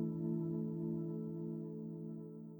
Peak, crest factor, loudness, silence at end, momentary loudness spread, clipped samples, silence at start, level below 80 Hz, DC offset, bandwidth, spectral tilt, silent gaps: -28 dBFS; 14 dB; -42 LUFS; 0 s; 8 LU; under 0.1%; 0 s; -74 dBFS; under 0.1%; over 20 kHz; -13 dB/octave; none